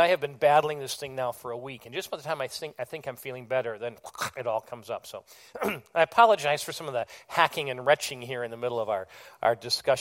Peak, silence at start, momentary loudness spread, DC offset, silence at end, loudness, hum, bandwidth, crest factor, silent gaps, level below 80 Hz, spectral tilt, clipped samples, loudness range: -4 dBFS; 0 s; 15 LU; under 0.1%; 0 s; -28 LUFS; none; 16.5 kHz; 24 dB; none; -70 dBFS; -3 dB/octave; under 0.1%; 8 LU